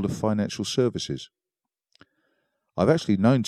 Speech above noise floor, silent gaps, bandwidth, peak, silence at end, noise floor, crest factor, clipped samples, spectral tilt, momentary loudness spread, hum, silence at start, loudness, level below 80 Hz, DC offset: 65 dB; none; 13 kHz; -6 dBFS; 0 s; -88 dBFS; 20 dB; under 0.1%; -6 dB/octave; 15 LU; none; 0 s; -25 LUFS; -58 dBFS; under 0.1%